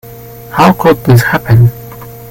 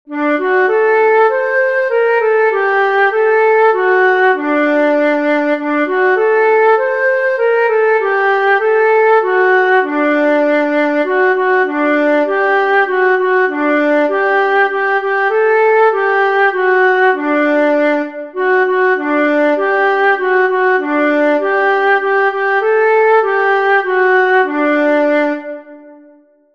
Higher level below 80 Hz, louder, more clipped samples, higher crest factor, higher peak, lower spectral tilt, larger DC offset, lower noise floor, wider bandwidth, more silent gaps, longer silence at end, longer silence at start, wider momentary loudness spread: first, -34 dBFS vs -64 dBFS; first, -9 LUFS vs -12 LUFS; first, 0.4% vs under 0.1%; about the same, 10 dB vs 10 dB; about the same, 0 dBFS vs -2 dBFS; first, -7 dB/octave vs -4 dB/octave; second, under 0.1% vs 0.4%; second, -28 dBFS vs -46 dBFS; first, 17 kHz vs 6.6 kHz; neither; second, 0 s vs 0.6 s; about the same, 0.05 s vs 0.1 s; first, 22 LU vs 3 LU